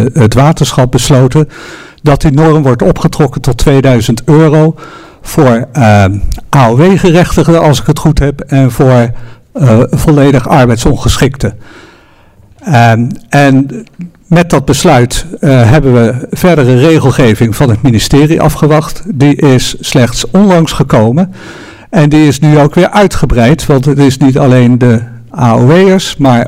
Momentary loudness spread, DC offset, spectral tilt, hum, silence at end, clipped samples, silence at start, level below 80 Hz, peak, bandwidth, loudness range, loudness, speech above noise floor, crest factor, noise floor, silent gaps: 7 LU; under 0.1%; -6.5 dB/octave; none; 0 s; 5%; 0 s; -22 dBFS; 0 dBFS; 16 kHz; 2 LU; -7 LUFS; 34 dB; 6 dB; -40 dBFS; none